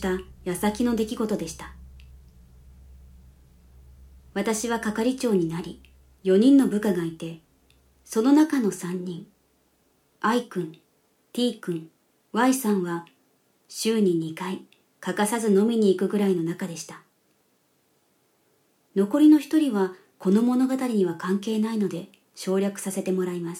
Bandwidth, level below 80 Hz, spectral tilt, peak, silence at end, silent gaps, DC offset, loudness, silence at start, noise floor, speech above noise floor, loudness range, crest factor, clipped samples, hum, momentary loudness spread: 16.5 kHz; -56 dBFS; -5.5 dB/octave; -8 dBFS; 0 s; none; under 0.1%; -24 LUFS; 0 s; -67 dBFS; 44 dB; 8 LU; 18 dB; under 0.1%; none; 16 LU